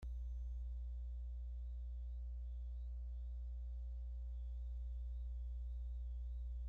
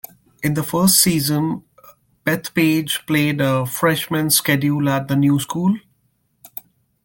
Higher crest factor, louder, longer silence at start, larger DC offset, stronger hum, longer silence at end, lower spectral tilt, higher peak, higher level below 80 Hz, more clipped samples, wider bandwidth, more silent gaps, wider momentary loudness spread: second, 6 dB vs 20 dB; second, -49 LUFS vs -18 LUFS; second, 0 s vs 0.4 s; neither; first, 60 Hz at -45 dBFS vs none; second, 0 s vs 0.6 s; first, -9.5 dB/octave vs -4 dB/octave; second, -40 dBFS vs 0 dBFS; first, -46 dBFS vs -56 dBFS; neither; second, 0.8 kHz vs 17 kHz; neither; second, 1 LU vs 14 LU